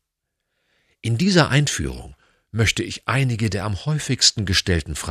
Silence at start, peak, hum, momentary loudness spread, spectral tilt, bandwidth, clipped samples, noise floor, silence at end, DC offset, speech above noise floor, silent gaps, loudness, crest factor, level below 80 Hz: 1.05 s; -2 dBFS; none; 11 LU; -4 dB/octave; 14 kHz; under 0.1%; -79 dBFS; 0 s; under 0.1%; 58 dB; none; -20 LUFS; 20 dB; -40 dBFS